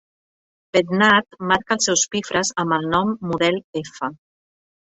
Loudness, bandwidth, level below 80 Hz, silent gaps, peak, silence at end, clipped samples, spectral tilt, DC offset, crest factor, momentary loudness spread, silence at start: -20 LUFS; 8.4 kHz; -56 dBFS; 3.64-3.73 s; -2 dBFS; 0.7 s; under 0.1%; -3 dB/octave; under 0.1%; 18 dB; 13 LU; 0.75 s